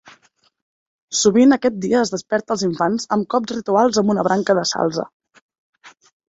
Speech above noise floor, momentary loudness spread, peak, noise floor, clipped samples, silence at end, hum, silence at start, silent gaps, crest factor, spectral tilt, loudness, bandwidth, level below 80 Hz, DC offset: 40 dB; 9 LU; -2 dBFS; -58 dBFS; under 0.1%; 0.4 s; none; 1.1 s; 5.13-5.20 s, 5.42-5.49 s, 5.58-5.73 s; 18 dB; -4.5 dB/octave; -18 LUFS; 8 kHz; -60 dBFS; under 0.1%